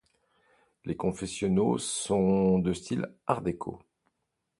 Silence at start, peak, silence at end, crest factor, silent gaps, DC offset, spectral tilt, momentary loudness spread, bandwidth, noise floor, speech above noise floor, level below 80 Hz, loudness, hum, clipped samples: 0.85 s; -10 dBFS; 0.85 s; 20 dB; none; under 0.1%; -6 dB/octave; 13 LU; 11.5 kHz; -82 dBFS; 53 dB; -56 dBFS; -29 LUFS; none; under 0.1%